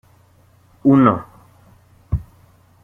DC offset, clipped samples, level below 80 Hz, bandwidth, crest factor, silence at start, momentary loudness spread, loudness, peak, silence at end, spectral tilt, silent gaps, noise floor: under 0.1%; under 0.1%; -38 dBFS; 3.6 kHz; 18 dB; 0.85 s; 14 LU; -17 LUFS; -2 dBFS; 0.6 s; -10 dB/octave; none; -53 dBFS